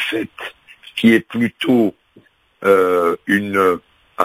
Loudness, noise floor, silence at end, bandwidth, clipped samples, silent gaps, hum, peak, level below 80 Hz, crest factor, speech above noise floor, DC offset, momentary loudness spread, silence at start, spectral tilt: -16 LUFS; -52 dBFS; 0 s; 16 kHz; under 0.1%; none; none; 0 dBFS; -56 dBFS; 18 dB; 36 dB; under 0.1%; 14 LU; 0 s; -5.5 dB/octave